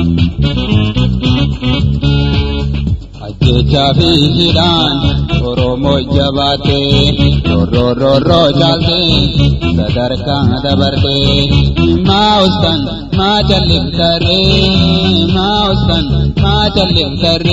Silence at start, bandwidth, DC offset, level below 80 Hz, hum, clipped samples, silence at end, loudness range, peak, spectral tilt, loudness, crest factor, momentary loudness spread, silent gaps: 0 s; 7.8 kHz; under 0.1%; -22 dBFS; none; 0.1%; 0 s; 2 LU; 0 dBFS; -7 dB/octave; -11 LUFS; 10 dB; 5 LU; none